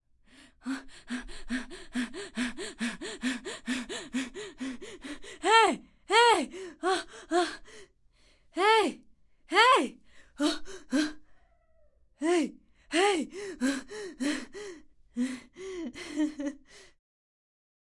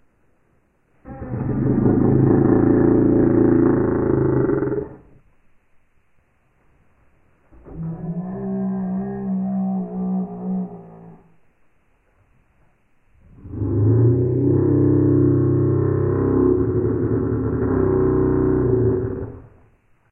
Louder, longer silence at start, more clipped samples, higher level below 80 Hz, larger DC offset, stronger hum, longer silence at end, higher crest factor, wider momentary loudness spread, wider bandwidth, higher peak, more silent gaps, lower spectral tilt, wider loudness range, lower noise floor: second, -29 LUFS vs -19 LUFS; second, 0.65 s vs 1.05 s; neither; second, -58 dBFS vs -38 dBFS; neither; neither; first, 1.15 s vs 0.7 s; first, 24 dB vs 16 dB; first, 19 LU vs 13 LU; first, 11.5 kHz vs 2.6 kHz; second, -8 dBFS vs -4 dBFS; neither; second, -2 dB/octave vs -15 dB/octave; second, 9 LU vs 15 LU; about the same, -63 dBFS vs -61 dBFS